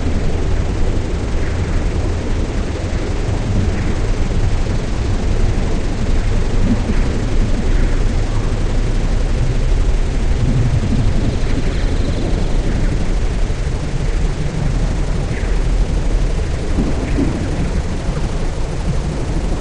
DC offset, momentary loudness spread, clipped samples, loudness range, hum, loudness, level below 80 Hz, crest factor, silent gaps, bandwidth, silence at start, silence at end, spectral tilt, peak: 0.5%; 3 LU; under 0.1%; 2 LU; none; -20 LUFS; -16 dBFS; 12 dB; none; 9.8 kHz; 0 s; 0 s; -6.5 dB/octave; -4 dBFS